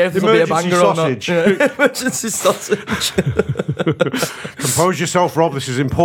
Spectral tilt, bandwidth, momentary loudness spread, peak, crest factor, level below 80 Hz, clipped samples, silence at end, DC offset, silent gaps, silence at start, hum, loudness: -4.5 dB/octave; 20 kHz; 6 LU; 0 dBFS; 16 dB; -44 dBFS; under 0.1%; 0 s; under 0.1%; none; 0 s; none; -16 LUFS